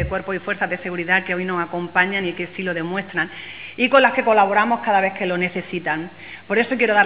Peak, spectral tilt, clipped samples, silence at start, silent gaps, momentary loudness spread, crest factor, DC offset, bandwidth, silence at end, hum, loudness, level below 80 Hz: 0 dBFS; -8.5 dB/octave; under 0.1%; 0 s; none; 10 LU; 20 dB; 0.4%; 4 kHz; 0 s; none; -20 LUFS; -46 dBFS